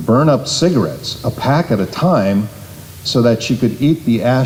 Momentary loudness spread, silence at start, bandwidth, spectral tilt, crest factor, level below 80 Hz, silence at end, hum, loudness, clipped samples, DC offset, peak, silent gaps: 8 LU; 0 s; 16.5 kHz; -6 dB/octave; 12 dB; -46 dBFS; 0 s; none; -15 LUFS; under 0.1%; under 0.1%; -2 dBFS; none